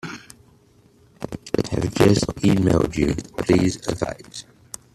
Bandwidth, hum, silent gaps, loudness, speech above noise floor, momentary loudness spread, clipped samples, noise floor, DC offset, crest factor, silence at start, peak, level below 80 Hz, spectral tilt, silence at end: 14 kHz; none; none; -21 LUFS; 35 dB; 20 LU; under 0.1%; -55 dBFS; under 0.1%; 20 dB; 0.05 s; -2 dBFS; -42 dBFS; -6 dB/octave; 0.55 s